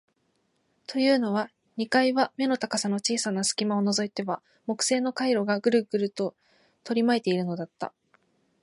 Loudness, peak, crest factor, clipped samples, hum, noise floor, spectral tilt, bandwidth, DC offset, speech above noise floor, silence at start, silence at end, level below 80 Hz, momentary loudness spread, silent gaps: -26 LUFS; -10 dBFS; 18 dB; under 0.1%; none; -72 dBFS; -4 dB/octave; 11.5 kHz; under 0.1%; 46 dB; 0.9 s; 0.75 s; -78 dBFS; 11 LU; none